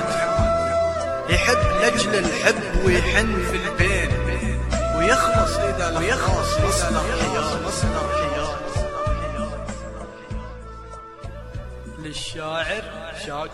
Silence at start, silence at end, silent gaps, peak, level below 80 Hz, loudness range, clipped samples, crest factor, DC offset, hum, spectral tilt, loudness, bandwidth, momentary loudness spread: 0 s; 0 s; none; -2 dBFS; -30 dBFS; 12 LU; under 0.1%; 20 dB; under 0.1%; none; -4.5 dB/octave; -21 LUFS; 14 kHz; 17 LU